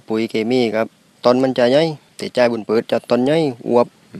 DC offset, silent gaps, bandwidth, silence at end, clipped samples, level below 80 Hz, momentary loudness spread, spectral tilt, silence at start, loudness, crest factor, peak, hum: under 0.1%; none; 12.5 kHz; 0 s; under 0.1%; -64 dBFS; 7 LU; -6 dB/octave; 0.1 s; -17 LUFS; 18 dB; 0 dBFS; none